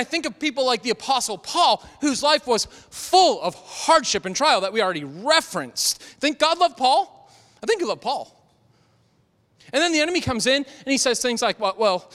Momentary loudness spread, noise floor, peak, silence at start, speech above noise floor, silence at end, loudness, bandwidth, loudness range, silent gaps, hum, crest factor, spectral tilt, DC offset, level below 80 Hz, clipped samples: 9 LU; -63 dBFS; -4 dBFS; 0 s; 41 dB; 0.1 s; -21 LUFS; 16 kHz; 5 LU; none; none; 18 dB; -2 dB/octave; under 0.1%; -58 dBFS; under 0.1%